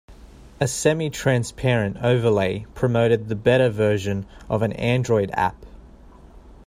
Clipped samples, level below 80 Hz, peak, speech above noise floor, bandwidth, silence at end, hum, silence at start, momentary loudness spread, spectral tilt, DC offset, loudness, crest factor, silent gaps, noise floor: under 0.1%; -46 dBFS; -4 dBFS; 25 dB; 15.5 kHz; 0.15 s; none; 0.1 s; 7 LU; -6 dB/octave; under 0.1%; -22 LUFS; 18 dB; none; -46 dBFS